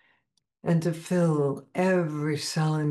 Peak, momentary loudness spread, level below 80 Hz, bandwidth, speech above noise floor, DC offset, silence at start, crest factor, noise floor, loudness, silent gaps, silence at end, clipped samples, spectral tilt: -14 dBFS; 4 LU; -72 dBFS; 12.5 kHz; 48 dB; under 0.1%; 0.65 s; 12 dB; -74 dBFS; -27 LUFS; none; 0 s; under 0.1%; -6.5 dB/octave